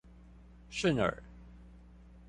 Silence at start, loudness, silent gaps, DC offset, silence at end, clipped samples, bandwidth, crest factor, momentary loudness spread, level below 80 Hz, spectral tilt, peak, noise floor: 0.15 s; -33 LUFS; none; under 0.1%; 0.1 s; under 0.1%; 11.5 kHz; 20 dB; 25 LU; -54 dBFS; -5.5 dB/octave; -16 dBFS; -55 dBFS